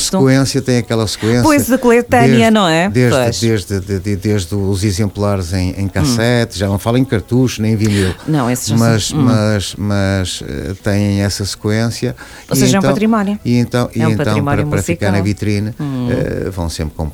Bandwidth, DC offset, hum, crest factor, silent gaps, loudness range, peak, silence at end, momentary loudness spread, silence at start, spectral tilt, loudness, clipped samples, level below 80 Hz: 19 kHz; under 0.1%; none; 14 dB; none; 4 LU; 0 dBFS; 0 s; 8 LU; 0 s; -5.5 dB/octave; -14 LUFS; under 0.1%; -36 dBFS